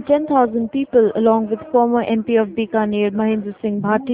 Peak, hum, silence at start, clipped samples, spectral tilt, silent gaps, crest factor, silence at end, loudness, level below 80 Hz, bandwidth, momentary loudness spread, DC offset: -2 dBFS; none; 0 s; under 0.1%; -11 dB/octave; none; 16 dB; 0 s; -18 LUFS; -54 dBFS; 3.9 kHz; 5 LU; under 0.1%